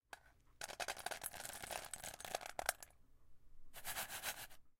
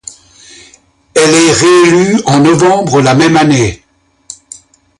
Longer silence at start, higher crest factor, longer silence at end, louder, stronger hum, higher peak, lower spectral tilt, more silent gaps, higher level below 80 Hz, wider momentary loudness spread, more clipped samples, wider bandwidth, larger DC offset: second, 0.1 s vs 1.15 s; first, 32 dB vs 10 dB; second, 0.05 s vs 0.65 s; second, -46 LUFS vs -8 LUFS; neither; second, -16 dBFS vs 0 dBFS; second, -0.5 dB/octave vs -4.5 dB/octave; neither; second, -66 dBFS vs -40 dBFS; first, 14 LU vs 10 LU; neither; first, 17 kHz vs 11.5 kHz; neither